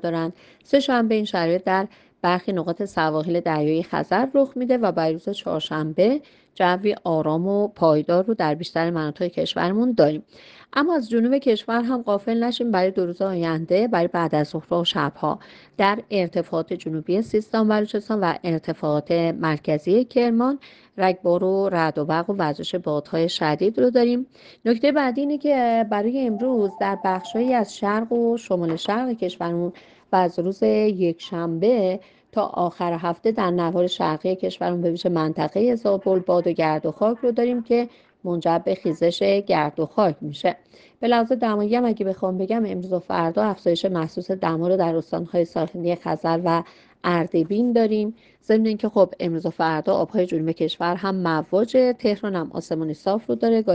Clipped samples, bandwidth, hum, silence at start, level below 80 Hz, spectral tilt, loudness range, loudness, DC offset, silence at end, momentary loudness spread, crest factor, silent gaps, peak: under 0.1%; 9 kHz; none; 0.05 s; -64 dBFS; -7 dB/octave; 2 LU; -22 LUFS; under 0.1%; 0 s; 6 LU; 18 dB; none; -4 dBFS